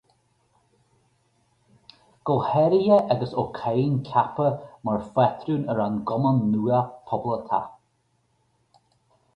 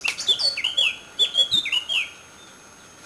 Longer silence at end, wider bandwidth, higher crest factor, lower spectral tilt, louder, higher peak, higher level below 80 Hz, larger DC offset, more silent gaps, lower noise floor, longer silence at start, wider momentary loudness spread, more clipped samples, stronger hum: first, 1.65 s vs 0 s; second, 5.8 kHz vs 11 kHz; about the same, 20 dB vs 18 dB; first, -9.5 dB/octave vs 1 dB/octave; second, -24 LUFS vs -20 LUFS; about the same, -6 dBFS vs -6 dBFS; about the same, -60 dBFS vs -64 dBFS; neither; neither; first, -69 dBFS vs -47 dBFS; first, 2.25 s vs 0 s; first, 9 LU vs 6 LU; neither; neither